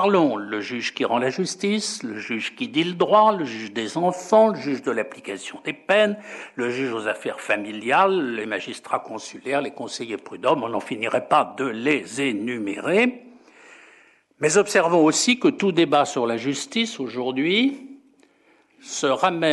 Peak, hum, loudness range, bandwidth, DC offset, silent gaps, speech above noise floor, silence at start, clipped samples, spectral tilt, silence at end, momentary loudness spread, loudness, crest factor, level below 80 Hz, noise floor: -4 dBFS; none; 5 LU; 12 kHz; under 0.1%; none; 37 dB; 0 s; under 0.1%; -4 dB/octave; 0 s; 12 LU; -22 LUFS; 18 dB; -76 dBFS; -59 dBFS